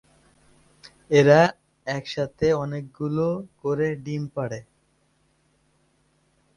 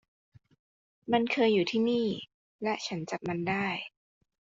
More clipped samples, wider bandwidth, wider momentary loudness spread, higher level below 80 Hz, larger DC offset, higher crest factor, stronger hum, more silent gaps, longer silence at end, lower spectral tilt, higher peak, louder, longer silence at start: neither; first, 11 kHz vs 7.6 kHz; about the same, 15 LU vs 14 LU; first, -58 dBFS vs -70 dBFS; neither; about the same, 22 dB vs 20 dB; neither; second, none vs 2.34-2.59 s; first, 1.95 s vs 0.65 s; first, -6.5 dB/octave vs -4 dB/octave; first, -4 dBFS vs -12 dBFS; first, -23 LUFS vs -30 LUFS; second, 0.85 s vs 1.05 s